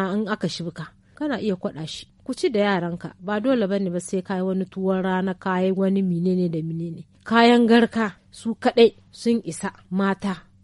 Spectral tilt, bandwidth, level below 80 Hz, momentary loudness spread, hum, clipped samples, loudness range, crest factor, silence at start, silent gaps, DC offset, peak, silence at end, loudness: -6 dB/octave; 11.5 kHz; -60 dBFS; 15 LU; none; under 0.1%; 5 LU; 18 dB; 0 s; none; under 0.1%; -4 dBFS; 0.25 s; -23 LUFS